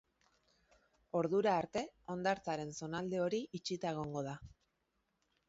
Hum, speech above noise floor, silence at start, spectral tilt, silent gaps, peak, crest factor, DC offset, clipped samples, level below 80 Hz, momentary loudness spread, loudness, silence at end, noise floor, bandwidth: none; 45 dB; 1.15 s; -5 dB/octave; none; -22 dBFS; 18 dB; under 0.1%; under 0.1%; -70 dBFS; 9 LU; -38 LUFS; 1 s; -83 dBFS; 7.6 kHz